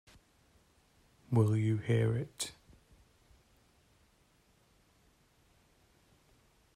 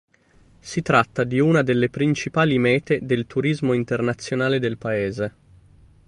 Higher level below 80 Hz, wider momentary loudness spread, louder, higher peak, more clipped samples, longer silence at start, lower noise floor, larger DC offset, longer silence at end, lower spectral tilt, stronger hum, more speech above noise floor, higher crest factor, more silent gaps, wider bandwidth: second, -68 dBFS vs -54 dBFS; first, 11 LU vs 7 LU; second, -33 LUFS vs -21 LUFS; second, -16 dBFS vs -4 dBFS; neither; first, 1.3 s vs 0.65 s; first, -69 dBFS vs -55 dBFS; neither; first, 4.25 s vs 0.8 s; about the same, -6.5 dB/octave vs -6.5 dB/octave; neither; first, 38 dB vs 34 dB; about the same, 22 dB vs 18 dB; neither; first, 13 kHz vs 11.5 kHz